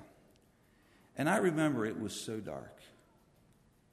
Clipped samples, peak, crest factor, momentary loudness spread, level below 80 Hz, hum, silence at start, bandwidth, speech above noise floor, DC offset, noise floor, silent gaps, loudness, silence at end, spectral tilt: under 0.1%; -18 dBFS; 20 dB; 18 LU; -72 dBFS; none; 0 s; 13.5 kHz; 33 dB; under 0.1%; -67 dBFS; none; -34 LUFS; 1.05 s; -5.5 dB/octave